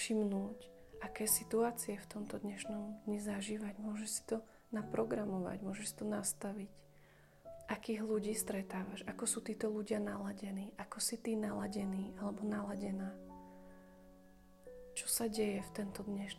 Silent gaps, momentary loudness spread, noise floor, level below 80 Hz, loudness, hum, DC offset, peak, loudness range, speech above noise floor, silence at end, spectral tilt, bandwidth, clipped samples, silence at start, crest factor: none; 17 LU; -64 dBFS; -68 dBFS; -40 LUFS; none; under 0.1%; -20 dBFS; 3 LU; 24 dB; 0 s; -4 dB/octave; 15.5 kHz; under 0.1%; 0 s; 20 dB